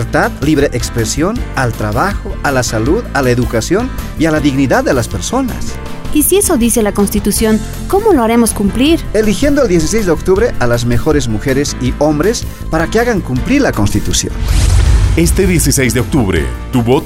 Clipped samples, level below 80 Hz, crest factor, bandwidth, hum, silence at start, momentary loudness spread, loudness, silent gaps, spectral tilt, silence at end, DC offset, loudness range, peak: under 0.1%; -20 dBFS; 12 dB; 16.5 kHz; none; 0 s; 6 LU; -13 LUFS; none; -5 dB/octave; 0 s; under 0.1%; 2 LU; 0 dBFS